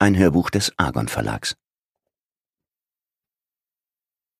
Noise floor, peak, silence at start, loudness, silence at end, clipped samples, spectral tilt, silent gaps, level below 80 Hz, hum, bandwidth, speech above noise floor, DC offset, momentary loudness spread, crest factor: under -90 dBFS; 0 dBFS; 0 s; -21 LUFS; 2.85 s; under 0.1%; -5 dB/octave; none; -46 dBFS; none; 15.5 kHz; over 70 dB; under 0.1%; 11 LU; 24 dB